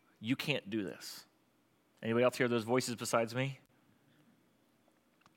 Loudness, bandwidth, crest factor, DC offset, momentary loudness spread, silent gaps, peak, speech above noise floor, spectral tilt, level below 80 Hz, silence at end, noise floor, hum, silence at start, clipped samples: -35 LUFS; 16.5 kHz; 22 dB; under 0.1%; 15 LU; none; -16 dBFS; 38 dB; -4.5 dB/octave; -88 dBFS; 1.8 s; -73 dBFS; none; 0.2 s; under 0.1%